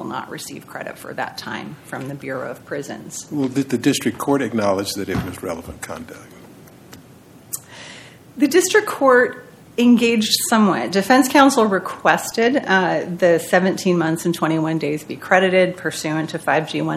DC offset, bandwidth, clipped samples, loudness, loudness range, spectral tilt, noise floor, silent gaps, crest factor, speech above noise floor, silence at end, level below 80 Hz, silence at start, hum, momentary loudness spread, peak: under 0.1%; 16 kHz; under 0.1%; -18 LUFS; 13 LU; -4.5 dB/octave; -45 dBFS; none; 20 dB; 26 dB; 0 s; -54 dBFS; 0 s; none; 17 LU; 0 dBFS